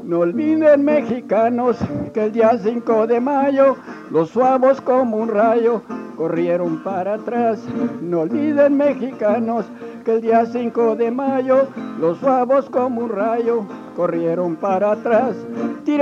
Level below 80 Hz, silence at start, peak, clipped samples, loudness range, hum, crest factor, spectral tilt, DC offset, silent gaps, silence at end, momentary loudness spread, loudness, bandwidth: -60 dBFS; 0 s; -2 dBFS; under 0.1%; 3 LU; none; 14 dB; -8 dB/octave; under 0.1%; none; 0 s; 8 LU; -18 LUFS; 7.4 kHz